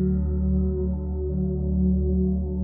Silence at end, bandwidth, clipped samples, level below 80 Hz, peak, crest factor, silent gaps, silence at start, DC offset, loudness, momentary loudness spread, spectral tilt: 0 s; 1.5 kHz; under 0.1%; -26 dBFS; -12 dBFS; 10 dB; none; 0 s; under 0.1%; -25 LUFS; 5 LU; -15 dB/octave